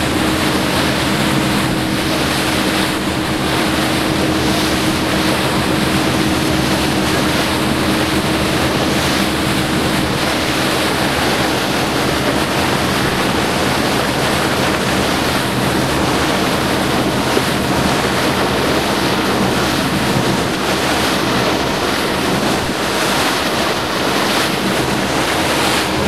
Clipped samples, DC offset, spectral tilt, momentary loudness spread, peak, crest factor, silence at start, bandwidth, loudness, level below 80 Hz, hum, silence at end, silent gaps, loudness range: under 0.1%; 0.8%; -4 dB/octave; 1 LU; 0 dBFS; 14 dB; 0 s; 16 kHz; -15 LUFS; -34 dBFS; none; 0 s; none; 1 LU